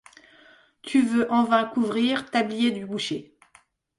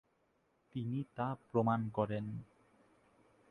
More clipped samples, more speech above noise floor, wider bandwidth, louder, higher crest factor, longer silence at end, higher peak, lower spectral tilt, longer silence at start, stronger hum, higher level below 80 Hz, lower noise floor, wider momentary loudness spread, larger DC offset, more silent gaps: neither; about the same, 37 dB vs 40 dB; first, 11.5 kHz vs 6.4 kHz; first, -24 LUFS vs -38 LUFS; about the same, 18 dB vs 20 dB; second, 0.75 s vs 1.05 s; first, -8 dBFS vs -20 dBFS; second, -4.5 dB/octave vs -10 dB/octave; about the same, 0.85 s vs 0.75 s; neither; about the same, -68 dBFS vs -70 dBFS; second, -60 dBFS vs -77 dBFS; second, 9 LU vs 12 LU; neither; neither